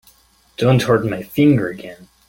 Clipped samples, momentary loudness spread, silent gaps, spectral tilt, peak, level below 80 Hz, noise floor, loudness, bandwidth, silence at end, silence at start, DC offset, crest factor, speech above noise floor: under 0.1%; 20 LU; none; -7 dB/octave; -2 dBFS; -50 dBFS; -53 dBFS; -17 LUFS; 17 kHz; 0.35 s; 0.6 s; under 0.1%; 16 dB; 37 dB